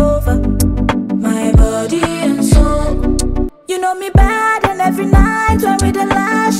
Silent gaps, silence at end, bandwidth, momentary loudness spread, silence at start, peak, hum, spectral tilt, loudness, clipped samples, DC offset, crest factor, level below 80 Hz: none; 0 s; 16 kHz; 5 LU; 0 s; 0 dBFS; none; -6 dB/octave; -14 LUFS; under 0.1%; under 0.1%; 12 dB; -16 dBFS